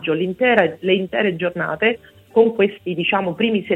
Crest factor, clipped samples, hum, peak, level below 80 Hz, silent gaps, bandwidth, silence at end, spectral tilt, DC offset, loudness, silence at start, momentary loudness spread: 18 dB; under 0.1%; none; 0 dBFS; -58 dBFS; none; 4.1 kHz; 0 s; -7.5 dB/octave; under 0.1%; -19 LUFS; 0 s; 6 LU